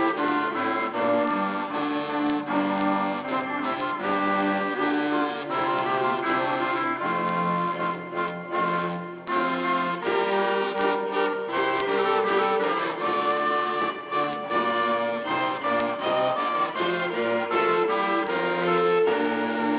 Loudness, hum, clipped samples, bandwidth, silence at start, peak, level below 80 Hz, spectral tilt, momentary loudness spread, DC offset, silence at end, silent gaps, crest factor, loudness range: -25 LUFS; none; under 0.1%; 4 kHz; 0 s; -10 dBFS; -70 dBFS; -9 dB/octave; 5 LU; under 0.1%; 0 s; none; 14 dB; 2 LU